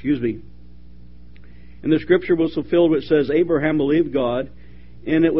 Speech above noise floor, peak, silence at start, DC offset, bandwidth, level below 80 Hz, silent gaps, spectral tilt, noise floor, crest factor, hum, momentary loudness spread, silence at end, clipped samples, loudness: 26 dB; -2 dBFS; 0.05 s; 1%; 5.6 kHz; -46 dBFS; none; -6 dB/octave; -44 dBFS; 18 dB; 60 Hz at -45 dBFS; 11 LU; 0 s; under 0.1%; -19 LUFS